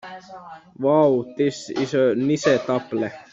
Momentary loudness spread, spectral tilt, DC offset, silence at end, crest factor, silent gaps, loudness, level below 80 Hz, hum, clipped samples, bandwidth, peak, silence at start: 21 LU; -6 dB/octave; under 0.1%; 0.1 s; 16 dB; none; -21 LUFS; -64 dBFS; none; under 0.1%; 7.8 kHz; -4 dBFS; 0.05 s